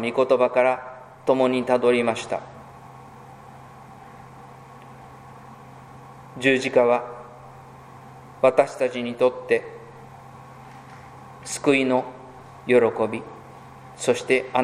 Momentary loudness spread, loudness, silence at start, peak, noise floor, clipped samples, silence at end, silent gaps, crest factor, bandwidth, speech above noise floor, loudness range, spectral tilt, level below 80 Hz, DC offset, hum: 25 LU; -22 LUFS; 0 s; -4 dBFS; -44 dBFS; under 0.1%; 0 s; none; 22 dB; 13 kHz; 23 dB; 16 LU; -4.5 dB/octave; -62 dBFS; under 0.1%; none